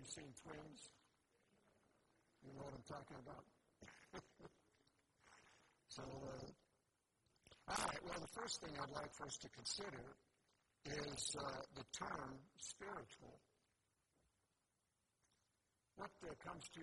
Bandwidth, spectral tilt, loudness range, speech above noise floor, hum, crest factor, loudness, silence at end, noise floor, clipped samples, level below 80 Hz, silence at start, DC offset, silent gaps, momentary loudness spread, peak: 11.5 kHz; -2.5 dB/octave; 12 LU; 36 dB; none; 28 dB; -51 LUFS; 0 s; -88 dBFS; under 0.1%; -74 dBFS; 0 s; under 0.1%; none; 19 LU; -28 dBFS